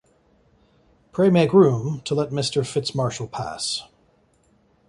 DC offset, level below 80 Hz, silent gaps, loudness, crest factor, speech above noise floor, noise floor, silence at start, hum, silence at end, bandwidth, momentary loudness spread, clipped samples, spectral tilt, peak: under 0.1%; -58 dBFS; none; -21 LUFS; 20 dB; 40 dB; -61 dBFS; 1.15 s; none; 1.05 s; 11.5 kHz; 14 LU; under 0.1%; -6 dB/octave; -2 dBFS